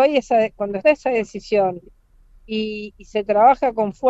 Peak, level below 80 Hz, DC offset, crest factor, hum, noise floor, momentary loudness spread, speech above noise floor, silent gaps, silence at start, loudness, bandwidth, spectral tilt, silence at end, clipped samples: -2 dBFS; -50 dBFS; under 0.1%; 16 dB; none; -50 dBFS; 13 LU; 32 dB; none; 0 s; -19 LUFS; 8 kHz; -5.5 dB/octave; 0 s; under 0.1%